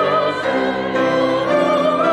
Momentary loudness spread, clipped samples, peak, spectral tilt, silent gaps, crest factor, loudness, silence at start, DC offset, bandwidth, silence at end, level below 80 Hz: 3 LU; under 0.1%; -4 dBFS; -5.5 dB/octave; none; 12 dB; -17 LUFS; 0 s; under 0.1%; 12 kHz; 0 s; -54 dBFS